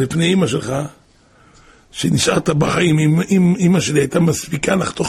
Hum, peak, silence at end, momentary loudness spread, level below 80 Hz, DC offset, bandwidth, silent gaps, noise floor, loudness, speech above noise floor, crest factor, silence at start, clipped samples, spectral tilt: none; -2 dBFS; 0 s; 9 LU; -44 dBFS; under 0.1%; 14.5 kHz; none; -50 dBFS; -16 LUFS; 35 dB; 14 dB; 0 s; under 0.1%; -5.5 dB/octave